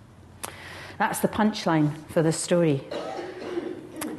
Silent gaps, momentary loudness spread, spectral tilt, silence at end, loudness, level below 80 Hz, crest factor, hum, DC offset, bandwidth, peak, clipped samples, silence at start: none; 15 LU; -5.5 dB/octave; 0 s; -26 LUFS; -60 dBFS; 18 dB; none; under 0.1%; 13 kHz; -8 dBFS; under 0.1%; 0.1 s